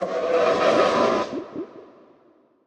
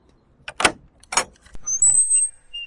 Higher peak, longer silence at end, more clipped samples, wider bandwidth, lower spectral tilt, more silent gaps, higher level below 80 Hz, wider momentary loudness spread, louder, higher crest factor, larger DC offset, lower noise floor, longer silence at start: second, -6 dBFS vs 0 dBFS; first, 0.8 s vs 0 s; neither; second, 10 kHz vs 11.5 kHz; first, -4.5 dB/octave vs 0.5 dB/octave; neither; second, -62 dBFS vs -50 dBFS; first, 17 LU vs 13 LU; second, -21 LUFS vs -18 LUFS; second, 16 dB vs 22 dB; neither; first, -58 dBFS vs -42 dBFS; second, 0 s vs 0.5 s